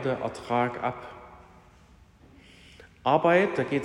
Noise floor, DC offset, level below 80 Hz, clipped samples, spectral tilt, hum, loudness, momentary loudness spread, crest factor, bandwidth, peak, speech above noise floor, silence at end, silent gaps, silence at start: -55 dBFS; under 0.1%; -60 dBFS; under 0.1%; -6.5 dB/octave; none; -26 LUFS; 21 LU; 20 dB; 11 kHz; -8 dBFS; 30 dB; 0 s; none; 0 s